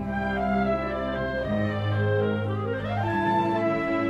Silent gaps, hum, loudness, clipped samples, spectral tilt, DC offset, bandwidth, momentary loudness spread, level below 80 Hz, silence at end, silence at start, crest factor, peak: none; none; -26 LUFS; under 0.1%; -8.5 dB/octave; under 0.1%; 7.6 kHz; 5 LU; -44 dBFS; 0 s; 0 s; 12 dB; -12 dBFS